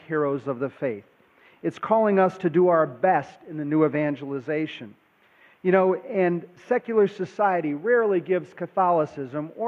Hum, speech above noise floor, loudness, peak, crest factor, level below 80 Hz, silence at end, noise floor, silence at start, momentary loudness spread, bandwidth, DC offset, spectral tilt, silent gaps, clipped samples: none; 34 dB; -24 LUFS; -6 dBFS; 18 dB; -74 dBFS; 0 s; -57 dBFS; 0.1 s; 12 LU; 7.2 kHz; under 0.1%; -8.5 dB/octave; none; under 0.1%